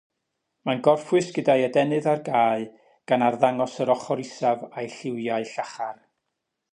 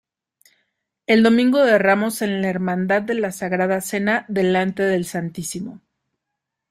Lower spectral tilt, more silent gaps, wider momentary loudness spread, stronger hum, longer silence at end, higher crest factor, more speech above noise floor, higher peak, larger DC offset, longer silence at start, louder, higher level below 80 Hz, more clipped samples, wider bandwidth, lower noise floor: about the same, -6 dB/octave vs -5.5 dB/octave; neither; about the same, 12 LU vs 13 LU; neither; second, 0.8 s vs 0.95 s; about the same, 20 dB vs 16 dB; second, 57 dB vs 62 dB; about the same, -6 dBFS vs -4 dBFS; neither; second, 0.65 s vs 1.1 s; second, -24 LUFS vs -19 LUFS; second, -76 dBFS vs -62 dBFS; neither; second, 10.5 kHz vs 15.5 kHz; about the same, -81 dBFS vs -81 dBFS